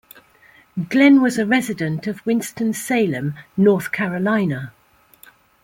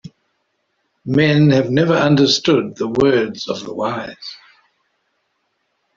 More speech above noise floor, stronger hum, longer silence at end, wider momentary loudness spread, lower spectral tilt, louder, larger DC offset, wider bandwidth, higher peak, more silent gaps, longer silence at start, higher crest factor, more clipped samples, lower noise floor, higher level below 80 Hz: second, 34 dB vs 53 dB; neither; second, 0.95 s vs 1.6 s; second, 13 LU vs 16 LU; about the same, -6 dB/octave vs -6 dB/octave; second, -19 LUFS vs -16 LUFS; neither; first, 16.5 kHz vs 7.6 kHz; about the same, -2 dBFS vs -2 dBFS; neither; second, 0.75 s vs 1.05 s; about the same, 16 dB vs 16 dB; neither; second, -52 dBFS vs -69 dBFS; second, -62 dBFS vs -54 dBFS